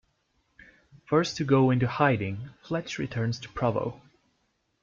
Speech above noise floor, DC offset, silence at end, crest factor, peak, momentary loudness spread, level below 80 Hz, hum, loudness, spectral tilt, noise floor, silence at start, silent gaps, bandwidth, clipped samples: 47 dB; under 0.1%; 0.85 s; 20 dB; -10 dBFS; 11 LU; -58 dBFS; none; -27 LUFS; -6.5 dB/octave; -74 dBFS; 1.1 s; none; 7.6 kHz; under 0.1%